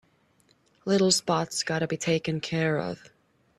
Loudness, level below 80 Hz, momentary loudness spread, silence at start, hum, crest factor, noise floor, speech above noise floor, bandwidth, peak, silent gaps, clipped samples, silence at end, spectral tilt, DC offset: -26 LUFS; -64 dBFS; 12 LU; 0.85 s; none; 20 dB; -65 dBFS; 39 dB; 14.5 kHz; -8 dBFS; none; under 0.1%; 0.65 s; -4 dB/octave; under 0.1%